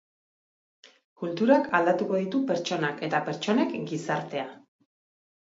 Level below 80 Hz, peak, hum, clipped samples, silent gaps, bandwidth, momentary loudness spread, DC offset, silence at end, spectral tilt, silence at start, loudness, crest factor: -76 dBFS; -8 dBFS; none; under 0.1%; 1.04-1.16 s; 7.8 kHz; 12 LU; under 0.1%; 0.9 s; -5.5 dB/octave; 0.85 s; -27 LUFS; 20 dB